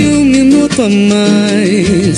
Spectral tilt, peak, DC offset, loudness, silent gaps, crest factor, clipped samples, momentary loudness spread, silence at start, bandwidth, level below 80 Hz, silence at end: -5.5 dB/octave; 0 dBFS; under 0.1%; -9 LUFS; none; 8 dB; under 0.1%; 3 LU; 0 s; 11.5 kHz; -34 dBFS; 0 s